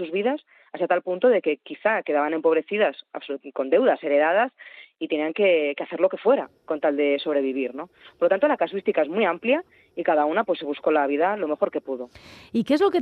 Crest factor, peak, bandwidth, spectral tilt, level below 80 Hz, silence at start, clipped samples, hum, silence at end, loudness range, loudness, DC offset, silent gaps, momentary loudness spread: 16 dB; -8 dBFS; 6.4 kHz; -6.5 dB/octave; -72 dBFS; 0 s; under 0.1%; none; 0 s; 1 LU; -23 LUFS; under 0.1%; none; 13 LU